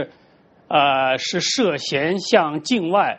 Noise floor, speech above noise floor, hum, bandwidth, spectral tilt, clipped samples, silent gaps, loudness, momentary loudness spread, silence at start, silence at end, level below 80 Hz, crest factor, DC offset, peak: -54 dBFS; 35 dB; none; 8.4 kHz; -3.5 dB/octave; under 0.1%; none; -19 LUFS; 4 LU; 0 s; 0 s; -62 dBFS; 18 dB; under 0.1%; -2 dBFS